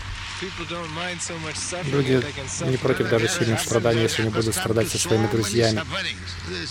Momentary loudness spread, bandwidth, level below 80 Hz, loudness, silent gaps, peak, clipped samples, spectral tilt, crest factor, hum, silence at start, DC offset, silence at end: 9 LU; 16.5 kHz; -46 dBFS; -23 LUFS; none; -6 dBFS; under 0.1%; -4.5 dB/octave; 18 dB; none; 0 s; under 0.1%; 0 s